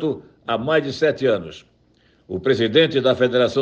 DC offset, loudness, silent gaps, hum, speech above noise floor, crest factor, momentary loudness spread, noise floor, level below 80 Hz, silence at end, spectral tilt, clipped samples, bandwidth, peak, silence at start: under 0.1%; -19 LUFS; none; none; 39 dB; 16 dB; 12 LU; -58 dBFS; -60 dBFS; 0 s; -6 dB/octave; under 0.1%; 8.2 kHz; -4 dBFS; 0 s